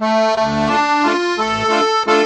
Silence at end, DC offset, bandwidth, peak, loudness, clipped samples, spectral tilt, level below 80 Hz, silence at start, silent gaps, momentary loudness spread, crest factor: 0 s; under 0.1%; 9.4 kHz; -2 dBFS; -15 LUFS; under 0.1%; -4 dB/octave; -46 dBFS; 0 s; none; 3 LU; 14 dB